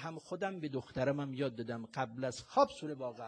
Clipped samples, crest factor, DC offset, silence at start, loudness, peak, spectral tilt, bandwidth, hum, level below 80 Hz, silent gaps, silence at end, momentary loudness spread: under 0.1%; 22 dB; under 0.1%; 0 s; -37 LUFS; -16 dBFS; -6 dB/octave; 10 kHz; none; -70 dBFS; none; 0 s; 10 LU